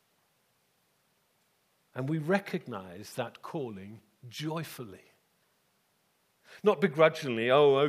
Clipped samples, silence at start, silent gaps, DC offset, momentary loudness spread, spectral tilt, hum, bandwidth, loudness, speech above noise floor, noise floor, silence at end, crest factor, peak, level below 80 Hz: under 0.1%; 1.95 s; none; under 0.1%; 21 LU; -6 dB/octave; none; 15.5 kHz; -30 LUFS; 44 dB; -73 dBFS; 0 s; 24 dB; -8 dBFS; -82 dBFS